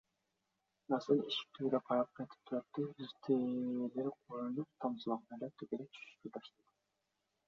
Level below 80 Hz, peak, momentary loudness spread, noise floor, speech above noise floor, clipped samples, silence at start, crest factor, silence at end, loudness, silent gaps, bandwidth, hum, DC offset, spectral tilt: -86 dBFS; -20 dBFS; 15 LU; -86 dBFS; 46 dB; under 0.1%; 0.9 s; 20 dB; 1 s; -40 LUFS; none; 7 kHz; none; under 0.1%; -5 dB/octave